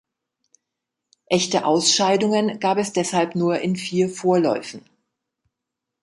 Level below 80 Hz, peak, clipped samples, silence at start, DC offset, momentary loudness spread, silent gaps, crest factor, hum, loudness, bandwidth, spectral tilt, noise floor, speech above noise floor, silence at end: -66 dBFS; -4 dBFS; under 0.1%; 1.3 s; under 0.1%; 7 LU; none; 18 dB; none; -20 LUFS; 11.5 kHz; -4 dB/octave; -83 dBFS; 63 dB; 1.25 s